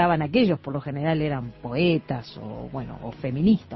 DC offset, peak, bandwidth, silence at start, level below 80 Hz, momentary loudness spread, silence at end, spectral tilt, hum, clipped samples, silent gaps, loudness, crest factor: under 0.1%; -8 dBFS; 6 kHz; 0 s; -50 dBFS; 13 LU; 0 s; -9.5 dB/octave; none; under 0.1%; none; -25 LUFS; 16 dB